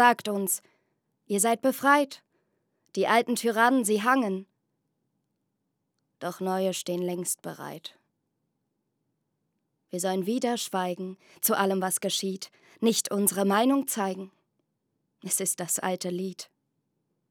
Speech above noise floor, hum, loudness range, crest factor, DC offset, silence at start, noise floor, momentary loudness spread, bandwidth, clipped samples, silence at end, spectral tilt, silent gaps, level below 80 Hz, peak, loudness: 53 dB; none; 8 LU; 24 dB; under 0.1%; 0 s; -80 dBFS; 16 LU; over 20 kHz; under 0.1%; 0.85 s; -3.5 dB/octave; none; under -90 dBFS; -6 dBFS; -27 LUFS